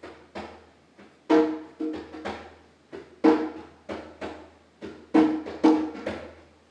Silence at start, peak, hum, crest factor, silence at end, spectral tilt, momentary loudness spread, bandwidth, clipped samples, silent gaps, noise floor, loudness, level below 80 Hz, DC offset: 0 s; -6 dBFS; none; 22 dB; 0.4 s; -6.5 dB/octave; 22 LU; 8.2 kHz; under 0.1%; none; -54 dBFS; -25 LUFS; -60 dBFS; under 0.1%